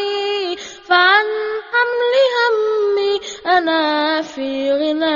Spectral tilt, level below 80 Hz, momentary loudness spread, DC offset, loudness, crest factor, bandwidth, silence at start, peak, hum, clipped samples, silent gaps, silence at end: 2 dB/octave; -60 dBFS; 9 LU; under 0.1%; -16 LUFS; 16 dB; 7.4 kHz; 0 s; 0 dBFS; none; under 0.1%; none; 0 s